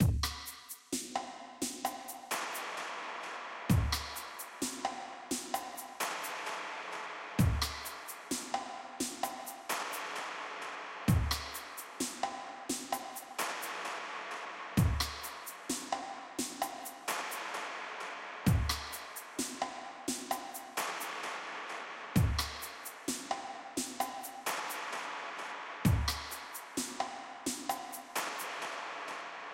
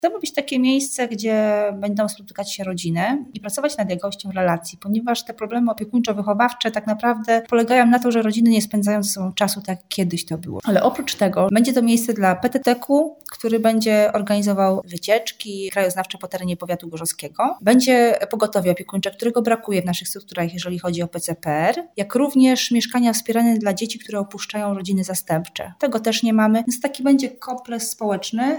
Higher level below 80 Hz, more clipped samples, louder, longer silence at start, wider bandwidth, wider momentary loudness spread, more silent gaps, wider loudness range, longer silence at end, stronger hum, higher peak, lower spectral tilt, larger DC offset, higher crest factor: first, -48 dBFS vs -62 dBFS; neither; second, -37 LUFS vs -20 LUFS; about the same, 0 s vs 0.05 s; second, 16 kHz vs over 20 kHz; about the same, 10 LU vs 10 LU; neither; about the same, 2 LU vs 4 LU; about the same, 0 s vs 0 s; neither; second, -14 dBFS vs -4 dBFS; about the same, -4 dB/octave vs -4.5 dB/octave; neither; first, 22 dB vs 16 dB